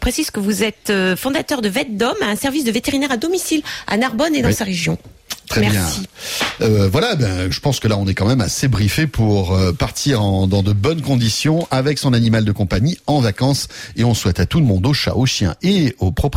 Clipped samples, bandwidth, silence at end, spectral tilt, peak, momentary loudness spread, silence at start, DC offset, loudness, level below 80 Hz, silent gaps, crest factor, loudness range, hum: under 0.1%; 16 kHz; 0 s; -5 dB/octave; -4 dBFS; 4 LU; 0 s; under 0.1%; -17 LUFS; -36 dBFS; none; 12 dB; 2 LU; none